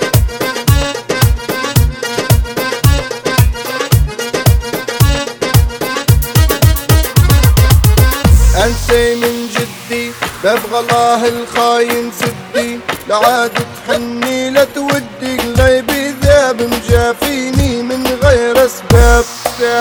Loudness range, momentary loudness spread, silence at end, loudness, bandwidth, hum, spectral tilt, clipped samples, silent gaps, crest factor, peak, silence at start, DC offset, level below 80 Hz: 4 LU; 8 LU; 0 s; -12 LUFS; over 20 kHz; none; -5 dB/octave; 0.3%; none; 12 dB; 0 dBFS; 0 s; under 0.1%; -18 dBFS